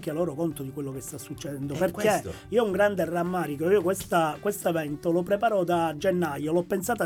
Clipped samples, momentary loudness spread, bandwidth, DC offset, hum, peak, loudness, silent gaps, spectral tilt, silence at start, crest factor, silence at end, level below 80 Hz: under 0.1%; 10 LU; 18 kHz; under 0.1%; none; -10 dBFS; -27 LUFS; none; -5.5 dB/octave; 0 s; 16 dB; 0 s; -58 dBFS